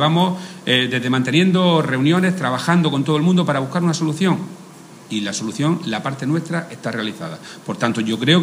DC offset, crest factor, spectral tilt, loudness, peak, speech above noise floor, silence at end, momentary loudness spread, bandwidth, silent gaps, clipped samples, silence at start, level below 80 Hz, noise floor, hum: under 0.1%; 18 dB; -5.5 dB/octave; -19 LUFS; 0 dBFS; 22 dB; 0 s; 11 LU; 15.5 kHz; none; under 0.1%; 0 s; -66 dBFS; -40 dBFS; none